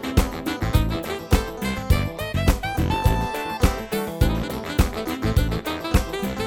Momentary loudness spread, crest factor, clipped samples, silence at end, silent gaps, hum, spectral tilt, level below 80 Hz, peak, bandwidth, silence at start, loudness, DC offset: 4 LU; 20 dB; under 0.1%; 0 s; none; none; -5.5 dB/octave; -26 dBFS; -2 dBFS; over 20 kHz; 0 s; -24 LUFS; under 0.1%